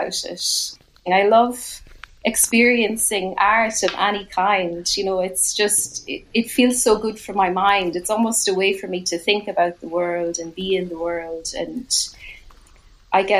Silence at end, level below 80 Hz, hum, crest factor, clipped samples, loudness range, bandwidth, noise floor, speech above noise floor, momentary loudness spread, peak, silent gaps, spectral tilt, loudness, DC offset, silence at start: 0 s; -50 dBFS; none; 20 dB; under 0.1%; 5 LU; 15 kHz; -49 dBFS; 29 dB; 11 LU; -2 dBFS; none; -2 dB/octave; -19 LUFS; under 0.1%; 0 s